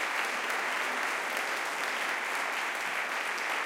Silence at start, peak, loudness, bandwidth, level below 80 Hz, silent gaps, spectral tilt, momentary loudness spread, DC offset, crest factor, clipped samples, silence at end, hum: 0 s; -14 dBFS; -31 LUFS; 17 kHz; -88 dBFS; none; 0 dB/octave; 1 LU; under 0.1%; 18 dB; under 0.1%; 0 s; none